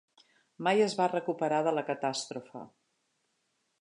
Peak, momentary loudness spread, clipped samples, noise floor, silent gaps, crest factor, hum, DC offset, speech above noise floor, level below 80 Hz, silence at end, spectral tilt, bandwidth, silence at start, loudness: -14 dBFS; 15 LU; under 0.1%; -78 dBFS; none; 18 dB; none; under 0.1%; 47 dB; -84 dBFS; 1.15 s; -4.5 dB/octave; 11 kHz; 0.6 s; -30 LUFS